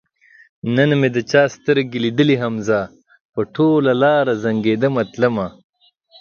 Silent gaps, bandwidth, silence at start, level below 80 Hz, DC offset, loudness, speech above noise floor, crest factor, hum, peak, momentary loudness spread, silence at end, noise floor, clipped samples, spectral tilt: 3.20-3.33 s; 7.2 kHz; 0.65 s; -56 dBFS; under 0.1%; -17 LUFS; 35 dB; 18 dB; none; 0 dBFS; 10 LU; 0.7 s; -51 dBFS; under 0.1%; -6.5 dB/octave